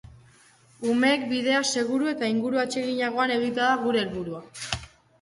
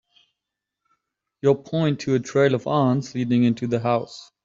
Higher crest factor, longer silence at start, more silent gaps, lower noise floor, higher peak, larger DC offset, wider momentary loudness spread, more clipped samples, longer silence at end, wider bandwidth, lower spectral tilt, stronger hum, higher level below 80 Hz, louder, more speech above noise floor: about the same, 20 dB vs 18 dB; second, 0.8 s vs 1.45 s; neither; second, -57 dBFS vs -84 dBFS; about the same, -6 dBFS vs -6 dBFS; neither; first, 10 LU vs 4 LU; neither; first, 0.35 s vs 0.2 s; first, 11.5 kHz vs 7.6 kHz; second, -3.5 dB/octave vs -7 dB/octave; neither; first, -56 dBFS vs -62 dBFS; second, -25 LUFS vs -22 LUFS; second, 32 dB vs 63 dB